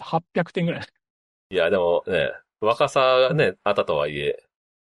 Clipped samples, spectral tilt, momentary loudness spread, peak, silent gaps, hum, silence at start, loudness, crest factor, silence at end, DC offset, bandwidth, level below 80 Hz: under 0.1%; -5.5 dB/octave; 10 LU; -6 dBFS; 1.10-1.50 s; none; 0 s; -22 LUFS; 18 dB; 0.5 s; under 0.1%; 11.5 kHz; -58 dBFS